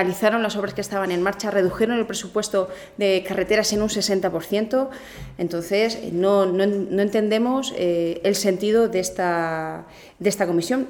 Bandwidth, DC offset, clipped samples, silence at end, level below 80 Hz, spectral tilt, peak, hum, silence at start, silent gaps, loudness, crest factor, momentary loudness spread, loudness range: over 20 kHz; under 0.1%; under 0.1%; 0 s; -52 dBFS; -4.5 dB/octave; -6 dBFS; none; 0 s; none; -22 LUFS; 16 dB; 7 LU; 2 LU